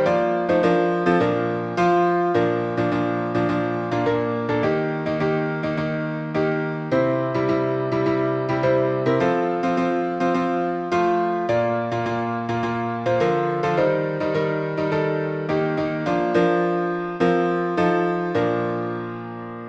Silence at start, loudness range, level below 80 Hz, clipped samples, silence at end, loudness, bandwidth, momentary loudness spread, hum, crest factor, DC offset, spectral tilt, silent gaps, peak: 0 s; 2 LU; -56 dBFS; under 0.1%; 0 s; -22 LUFS; 8 kHz; 5 LU; none; 16 dB; under 0.1%; -7.5 dB/octave; none; -6 dBFS